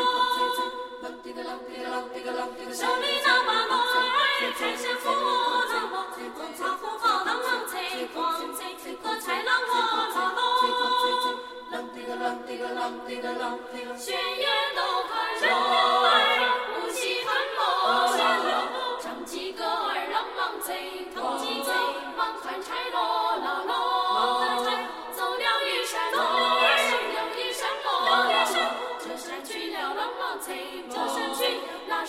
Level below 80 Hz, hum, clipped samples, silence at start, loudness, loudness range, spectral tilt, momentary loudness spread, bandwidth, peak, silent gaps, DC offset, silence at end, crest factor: -66 dBFS; none; under 0.1%; 0 s; -26 LUFS; 6 LU; 0 dB/octave; 13 LU; 16 kHz; -8 dBFS; none; under 0.1%; 0 s; 18 dB